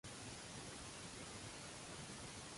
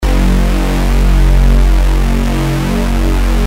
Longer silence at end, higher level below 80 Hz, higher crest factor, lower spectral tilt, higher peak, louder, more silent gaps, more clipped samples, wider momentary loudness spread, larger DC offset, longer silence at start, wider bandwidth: about the same, 0 s vs 0 s; second, -68 dBFS vs -10 dBFS; about the same, 12 dB vs 8 dB; second, -3 dB/octave vs -6 dB/octave; second, -40 dBFS vs -2 dBFS; second, -51 LUFS vs -13 LUFS; neither; neither; second, 0 LU vs 3 LU; neither; about the same, 0.05 s vs 0 s; second, 11.5 kHz vs 15.5 kHz